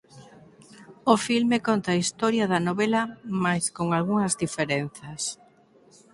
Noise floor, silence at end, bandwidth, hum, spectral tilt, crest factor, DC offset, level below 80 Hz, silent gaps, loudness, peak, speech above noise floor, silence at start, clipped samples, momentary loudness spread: -57 dBFS; 0.8 s; 11.5 kHz; none; -4.5 dB/octave; 22 dB; under 0.1%; -64 dBFS; none; -25 LUFS; -4 dBFS; 32 dB; 0.15 s; under 0.1%; 9 LU